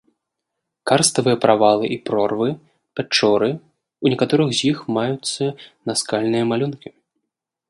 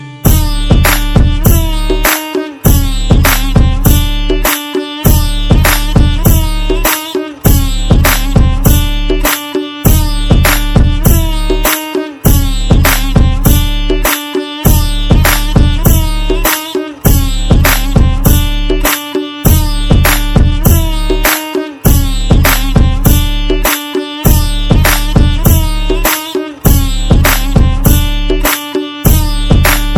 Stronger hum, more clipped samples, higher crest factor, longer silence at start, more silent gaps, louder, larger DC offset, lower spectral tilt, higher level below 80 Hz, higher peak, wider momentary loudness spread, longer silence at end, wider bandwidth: neither; second, under 0.1% vs 2%; first, 20 dB vs 8 dB; first, 0.85 s vs 0 s; neither; second, -19 LUFS vs -11 LUFS; neither; about the same, -4.5 dB/octave vs -4.5 dB/octave; second, -64 dBFS vs -12 dBFS; about the same, 0 dBFS vs 0 dBFS; first, 14 LU vs 5 LU; first, 0.8 s vs 0 s; second, 11.5 kHz vs over 20 kHz